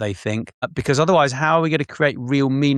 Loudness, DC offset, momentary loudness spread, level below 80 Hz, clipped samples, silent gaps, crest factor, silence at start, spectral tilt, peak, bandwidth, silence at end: -19 LUFS; under 0.1%; 9 LU; -52 dBFS; under 0.1%; 0.54-0.62 s; 16 dB; 0 s; -6 dB/octave; -4 dBFS; 11.5 kHz; 0 s